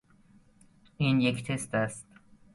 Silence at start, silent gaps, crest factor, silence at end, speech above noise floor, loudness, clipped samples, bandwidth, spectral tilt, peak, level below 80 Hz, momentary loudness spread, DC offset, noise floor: 1 s; none; 20 dB; 0.5 s; 32 dB; -29 LUFS; under 0.1%; 11.5 kHz; -5.5 dB/octave; -12 dBFS; -62 dBFS; 9 LU; under 0.1%; -60 dBFS